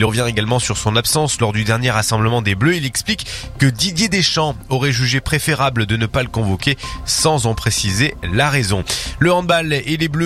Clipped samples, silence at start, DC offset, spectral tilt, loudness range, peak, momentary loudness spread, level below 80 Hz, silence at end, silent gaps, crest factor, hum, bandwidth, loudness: under 0.1%; 0 s; under 0.1%; -4 dB/octave; 1 LU; 0 dBFS; 4 LU; -36 dBFS; 0 s; none; 16 dB; none; 15.5 kHz; -16 LUFS